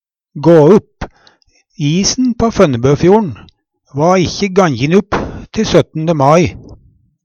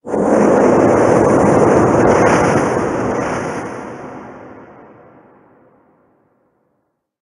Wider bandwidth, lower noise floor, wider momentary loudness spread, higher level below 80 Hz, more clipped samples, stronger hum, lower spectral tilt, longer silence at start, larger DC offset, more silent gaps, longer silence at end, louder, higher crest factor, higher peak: second, 8.2 kHz vs 11.5 kHz; second, -53 dBFS vs -68 dBFS; second, 13 LU vs 19 LU; first, -36 dBFS vs -42 dBFS; neither; neither; about the same, -6 dB/octave vs -6.5 dB/octave; first, 0.35 s vs 0.05 s; neither; neither; second, 0.5 s vs 2.55 s; about the same, -12 LUFS vs -13 LUFS; about the same, 12 dB vs 16 dB; about the same, 0 dBFS vs 0 dBFS